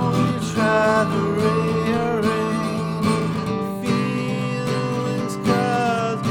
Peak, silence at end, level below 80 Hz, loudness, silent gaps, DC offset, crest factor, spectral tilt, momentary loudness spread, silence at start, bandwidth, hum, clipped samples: -6 dBFS; 0 s; -50 dBFS; -21 LUFS; none; under 0.1%; 16 dB; -6.5 dB/octave; 6 LU; 0 s; 17.5 kHz; none; under 0.1%